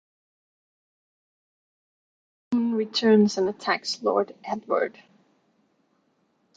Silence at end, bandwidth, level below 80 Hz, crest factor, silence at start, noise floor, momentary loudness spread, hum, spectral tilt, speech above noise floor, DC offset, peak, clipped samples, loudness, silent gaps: 1.65 s; 8 kHz; -74 dBFS; 20 dB; 2.5 s; -69 dBFS; 10 LU; none; -5 dB/octave; 45 dB; under 0.1%; -8 dBFS; under 0.1%; -24 LUFS; none